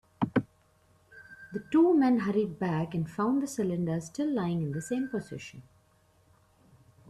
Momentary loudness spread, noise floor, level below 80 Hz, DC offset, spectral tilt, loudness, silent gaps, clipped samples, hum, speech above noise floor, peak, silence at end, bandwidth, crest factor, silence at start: 18 LU; -65 dBFS; -66 dBFS; under 0.1%; -7 dB/octave; -29 LUFS; none; under 0.1%; none; 37 dB; -10 dBFS; 1.5 s; 13.5 kHz; 20 dB; 0.2 s